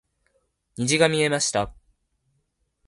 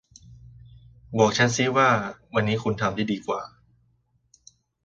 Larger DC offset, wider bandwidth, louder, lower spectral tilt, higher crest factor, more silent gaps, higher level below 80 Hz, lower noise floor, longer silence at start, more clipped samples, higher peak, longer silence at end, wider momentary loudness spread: neither; first, 11.5 kHz vs 9.2 kHz; about the same, -22 LUFS vs -23 LUFS; about the same, -3.5 dB/octave vs -4.5 dB/octave; about the same, 22 dB vs 20 dB; neither; about the same, -54 dBFS vs -56 dBFS; first, -72 dBFS vs -67 dBFS; first, 0.8 s vs 0.3 s; neither; about the same, -4 dBFS vs -6 dBFS; second, 1.15 s vs 1.35 s; about the same, 13 LU vs 12 LU